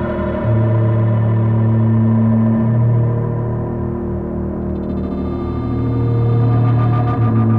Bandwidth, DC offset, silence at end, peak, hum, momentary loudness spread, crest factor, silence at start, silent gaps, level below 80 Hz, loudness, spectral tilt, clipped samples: 3.8 kHz; under 0.1%; 0 s; -6 dBFS; none; 8 LU; 10 dB; 0 s; none; -32 dBFS; -16 LUFS; -12 dB/octave; under 0.1%